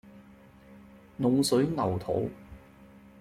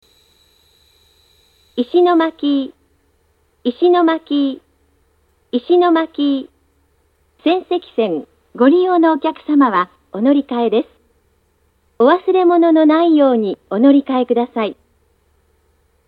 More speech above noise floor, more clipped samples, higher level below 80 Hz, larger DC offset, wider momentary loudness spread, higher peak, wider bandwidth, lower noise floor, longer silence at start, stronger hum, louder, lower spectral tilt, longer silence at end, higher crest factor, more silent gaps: second, 27 dB vs 46 dB; neither; about the same, -58 dBFS vs -62 dBFS; neither; first, 19 LU vs 12 LU; second, -14 dBFS vs 0 dBFS; first, 15.5 kHz vs 4.9 kHz; second, -54 dBFS vs -60 dBFS; second, 0.05 s vs 1.75 s; neither; second, -28 LUFS vs -15 LUFS; second, -6 dB/octave vs -7.5 dB/octave; second, 0.35 s vs 1.35 s; about the same, 18 dB vs 16 dB; neither